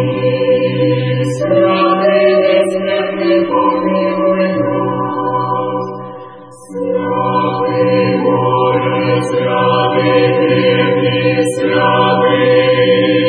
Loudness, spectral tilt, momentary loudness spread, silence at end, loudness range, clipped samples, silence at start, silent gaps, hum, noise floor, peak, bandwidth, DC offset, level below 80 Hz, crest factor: -13 LUFS; -6.5 dB/octave; 6 LU; 0 s; 5 LU; under 0.1%; 0 s; none; none; -33 dBFS; 0 dBFS; 10.5 kHz; under 0.1%; -54 dBFS; 12 dB